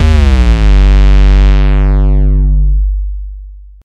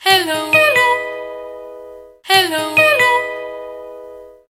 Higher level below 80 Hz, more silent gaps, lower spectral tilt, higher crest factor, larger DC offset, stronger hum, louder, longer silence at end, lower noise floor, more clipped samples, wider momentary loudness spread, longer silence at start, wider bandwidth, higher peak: first, -8 dBFS vs -60 dBFS; neither; first, -7.5 dB/octave vs -2 dB/octave; second, 6 dB vs 16 dB; neither; neither; first, -10 LUFS vs -13 LUFS; about the same, 0.25 s vs 0.2 s; second, -29 dBFS vs -37 dBFS; neither; second, 11 LU vs 22 LU; about the same, 0 s vs 0 s; second, 6.4 kHz vs 17 kHz; about the same, 0 dBFS vs 0 dBFS